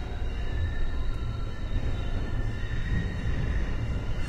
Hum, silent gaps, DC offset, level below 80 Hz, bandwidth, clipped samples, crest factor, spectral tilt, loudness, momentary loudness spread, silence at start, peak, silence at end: none; none; under 0.1%; -30 dBFS; 8 kHz; under 0.1%; 12 dB; -7 dB/octave; -33 LUFS; 4 LU; 0 s; -16 dBFS; 0 s